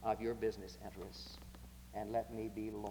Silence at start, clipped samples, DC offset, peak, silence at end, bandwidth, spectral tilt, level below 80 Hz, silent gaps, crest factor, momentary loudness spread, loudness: 0 s; under 0.1%; under 0.1%; -24 dBFS; 0 s; over 20 kHz; -6 dB/octave; -58 dBFS; none; 18 dB; 14 LU; -44 LUFS